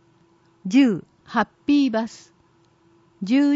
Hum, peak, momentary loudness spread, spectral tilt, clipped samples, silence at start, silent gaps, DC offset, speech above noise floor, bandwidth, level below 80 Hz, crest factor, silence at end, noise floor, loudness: none; -8 dBFS; 15 LU; -6 dB/octave; under 0.1%; 0.65 s; none; under 0.1%; 39 dB; 7.8 kHz; -66 dBFS; 16 dB; 0 s; -59 dBFS; -22 LUFS